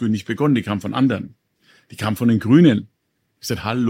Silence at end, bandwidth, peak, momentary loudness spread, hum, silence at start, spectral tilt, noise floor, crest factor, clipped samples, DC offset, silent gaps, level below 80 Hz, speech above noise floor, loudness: 0 s; 16.5 kHz; -2 dBFS; 14 LU; none; 0 s; -7 dB/octave; -69 dBFS; 18 dB; under 0.1%; under 0.1%; none; -56 dBFS; 51 dB; -19 LUFS